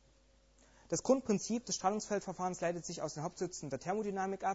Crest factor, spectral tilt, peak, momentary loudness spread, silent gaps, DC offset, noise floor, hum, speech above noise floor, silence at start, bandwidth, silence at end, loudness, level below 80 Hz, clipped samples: 20 dB; -4.5 dB/octave; -16 dBFS; 8 LU; none; under 0.1%; -67 dBFS; none; 31 dB; 0.9 s; 8.2 kHz; 0 s; -37 LUFS; -68 dBFS; under 0.1%